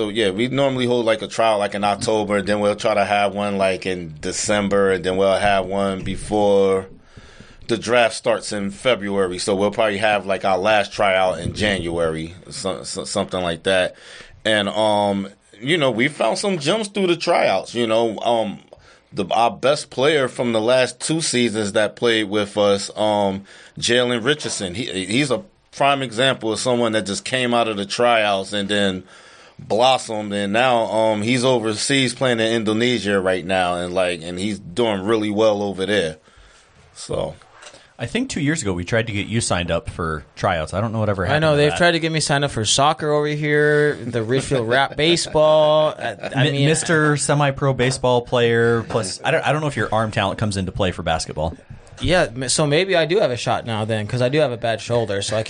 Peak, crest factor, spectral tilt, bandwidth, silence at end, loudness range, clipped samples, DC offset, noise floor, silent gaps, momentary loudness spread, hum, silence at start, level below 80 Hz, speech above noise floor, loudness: -2 dBFS; 18 dB; -4.5 dB/octave; 10 kHz; 0 s; 4 LU; under 0.1%; under 0.1%; -50 dBFS; none; 8 LU; none; 0 s; -46 dBFS; 31 dB; -19 LUFS